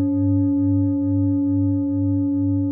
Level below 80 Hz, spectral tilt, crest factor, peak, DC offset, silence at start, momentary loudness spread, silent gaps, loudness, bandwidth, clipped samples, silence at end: -58 dBFS; -17.5 dB/octave; 8 dB; -10 dBFS; under 0.1%; 0 s; 2 LU; none; -20 LUFS; 1.7 kHz; under 0.1%; 0 s